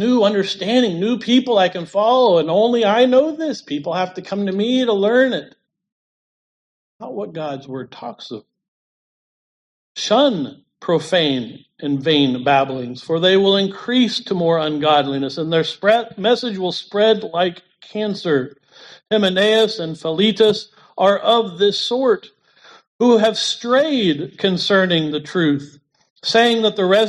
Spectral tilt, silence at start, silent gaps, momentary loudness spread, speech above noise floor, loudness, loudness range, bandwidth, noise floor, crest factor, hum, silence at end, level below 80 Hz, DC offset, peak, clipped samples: -5 dB/octave; 0 s; 5.92-6.99 s, 8.68-9.95 s, 22.87-22.99 s, 26.10-26.16 s; 13 LU; 31 dB; -17 LUFS; 7 LU; 11.5 kHz; -48 dBFS; 16 dB; none; 0 s; -66 dBFS; under 0.1%; -2 dBFS; under 0.1%